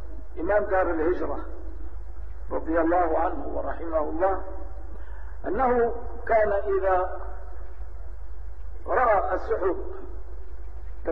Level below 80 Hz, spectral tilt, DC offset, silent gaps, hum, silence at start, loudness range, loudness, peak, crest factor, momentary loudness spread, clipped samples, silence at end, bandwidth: -38 dBFS; -9.5 dB/octave; 3%; none; none; 0 s; 2 LU; -26 LUFS; -10 dBFS; 16 dB; 19 LU; under 0.1%; 0 s; 5.4 kHz